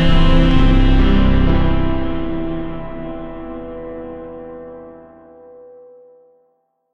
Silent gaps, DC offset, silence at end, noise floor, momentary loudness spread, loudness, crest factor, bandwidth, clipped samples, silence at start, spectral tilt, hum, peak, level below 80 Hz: none; under 0.1%; 0 s; -64 dBFS; 19 LU; -18 LUFS; 16 dB; 5.6 kHz; under 0.1%; 0 s; -8 dB/octave; none; 0 dBFS; -18 dBFS